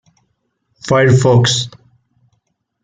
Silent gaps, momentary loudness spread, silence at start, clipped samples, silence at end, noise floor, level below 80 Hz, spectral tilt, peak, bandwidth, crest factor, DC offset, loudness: none; 16 LU; 0.85 s; under 0.1%; 1.15 s; -67 dBFS; -50 dBFS; -5 dB/octave; -2 dBFS; 9.4 kHz; 14 dB; under 0.1%; -12 LUFS